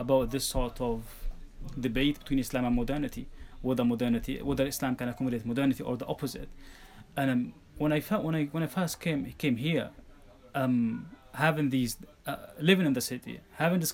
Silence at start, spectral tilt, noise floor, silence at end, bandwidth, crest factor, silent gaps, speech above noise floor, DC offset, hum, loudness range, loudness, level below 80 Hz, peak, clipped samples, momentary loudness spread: 0 s; -5.5 dB/octave; -53 dBFS; 0 s; 17.5 kHz; 22 dB; none; 24 dB; under 0.1%; none; 3 LU; -31 LUFS; -44 dBFS; -8 dBFS; under 0.1%; 13 LU